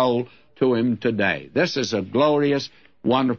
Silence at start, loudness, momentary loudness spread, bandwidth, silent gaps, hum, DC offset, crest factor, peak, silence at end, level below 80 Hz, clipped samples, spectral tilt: 0 s; -22 LUFS; 8 LU; 7 kHz; none; none; 0.2%; 16 dB; -6 dBFS; 0 s; -64 dBFS; under 0.1%; -5.5 dB/octave